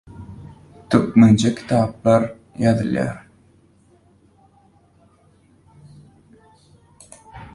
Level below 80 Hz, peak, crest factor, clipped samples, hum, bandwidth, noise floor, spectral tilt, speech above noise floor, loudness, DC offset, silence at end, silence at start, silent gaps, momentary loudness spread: -50 dBFS; -2 dBFS; 20 dB; under 0.1%; none; 11.5 kHz; -55 dBFS; -7 dB/octave; 39 dB; -18 LUFS; under 0.1%; 0.05 s; 0.2 s; none; 27 LU